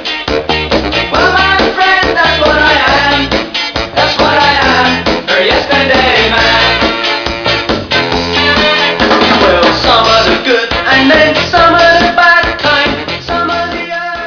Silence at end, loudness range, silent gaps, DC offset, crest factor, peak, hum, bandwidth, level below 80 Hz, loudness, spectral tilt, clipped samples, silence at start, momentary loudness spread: 0 s; 2 LU; none; under 0.1%; 10 dB; 0 dBFS; none; 5.4 kHz; -28 dBFS; -8 LUFS; -4 dB/octave; 0.2%; 0 s; 7 LU